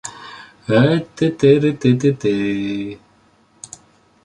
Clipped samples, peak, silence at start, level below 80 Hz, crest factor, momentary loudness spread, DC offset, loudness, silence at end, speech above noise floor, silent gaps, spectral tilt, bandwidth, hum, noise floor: under 0.1%; -2 dBFS; 0.05 s; -54 dBFS; 16 dB; 23 LU; under 0.1%; -17 LUFS; 1.3 s; 39 dB; none; -7 dB/octave; 11 kHz; none; -55 dBFS